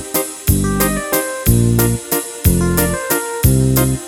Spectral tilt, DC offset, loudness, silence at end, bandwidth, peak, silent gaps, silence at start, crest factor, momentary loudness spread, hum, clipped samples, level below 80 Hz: -5 dB/octave; under 0.1%; -15 LUFS; 0 s; over 20 kHz; 0 dBFS; none; 0 s; 16 dB; 5 LU; none; under 0.1%; -24 dBFS